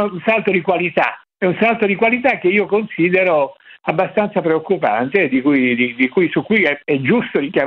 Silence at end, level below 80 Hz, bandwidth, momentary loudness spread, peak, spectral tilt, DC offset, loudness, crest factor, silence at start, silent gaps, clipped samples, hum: 0 s; -60 dBFS; 5.6 kHz; 4 LU; 0 dBFS; -8.5 dB/octave; under 0.1%; -16 LUFS; 16 dB; 0 s; none; under 0.1%; none